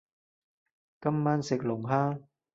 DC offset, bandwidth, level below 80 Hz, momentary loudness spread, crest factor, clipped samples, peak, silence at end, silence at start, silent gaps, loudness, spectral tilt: under 0.1%; 7.8 kHz; -70 dBFS; 6 LU; 20 dB; under 0.1%; -12 dBFS; 0.3 s; 1 s; none; -30 LUFS; -7.5 dB/octave